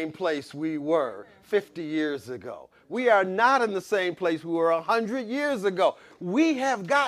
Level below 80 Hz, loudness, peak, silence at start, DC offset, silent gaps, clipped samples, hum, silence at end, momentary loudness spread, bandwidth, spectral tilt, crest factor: -74 dBFS; -26 LUFS; -8 dBFS; 0 s; under 0.1%; none; under 0.1%; none; 0 s; 13 LU; 14 kHz; -5 dB/octave; 18 dB